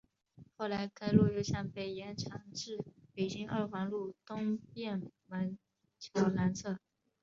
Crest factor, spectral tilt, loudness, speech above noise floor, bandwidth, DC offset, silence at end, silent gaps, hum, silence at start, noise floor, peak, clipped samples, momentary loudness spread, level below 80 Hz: 24 dB; -6.5 dB/octave; -37 LUFS; 26 dB; 7.6 kHz; under 0.1%; 0.45 s; none; none; 0.4 s; -61 dBFS; -12 dBFS; under 0.1%; 12 LU; -62 dBFS